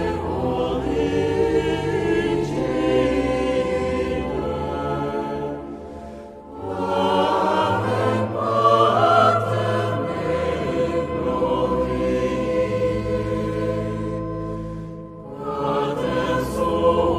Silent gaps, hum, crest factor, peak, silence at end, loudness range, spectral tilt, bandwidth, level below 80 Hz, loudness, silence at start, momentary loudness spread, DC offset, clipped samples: none; none; 18 dB; -4 dBFS; 0 s; 7 LU; -7 dB/octave; 14 kHz; -40 dBFS; -22 LUFS; 0 s; 12 LU; under 0.1%; under 0.1%